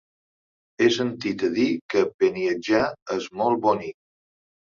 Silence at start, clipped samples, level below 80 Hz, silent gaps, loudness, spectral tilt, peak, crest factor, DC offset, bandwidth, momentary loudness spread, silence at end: 0.8 s; under 0.1%; -64 dBFS; 1.81-1.89 s, 2.14-2.19 s, 3.02-3.06 s; -23 LUFS; -5 dB/octave; -6 dBFS; 18 dB; under 0.1%; 7.4 kHz; 6 LU; 0.8 s